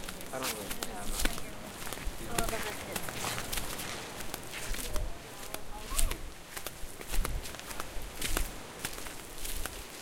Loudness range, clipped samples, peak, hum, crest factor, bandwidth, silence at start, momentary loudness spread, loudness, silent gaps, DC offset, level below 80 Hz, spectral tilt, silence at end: 3 LU; under 0.1%; -8 dBFS; none; 26 dB; 17 kHz; 0 s; 8 LU; -38 LUFS; none; under 0.1%; -40 dBFS; -2.5 dB/octave; 0 s